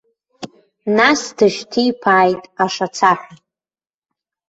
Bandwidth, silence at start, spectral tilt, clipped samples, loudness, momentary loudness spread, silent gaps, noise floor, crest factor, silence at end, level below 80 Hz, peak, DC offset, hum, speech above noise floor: 8.2 kHz; 0.4 s; -4 dB/octave; under 0.1%; -16 LUFS; 22 LU; none; under -90 dBFS; 18 dB; 1.15 s; -62 dBFS; 0 dBFS; under 0.1%; none; over 75 dB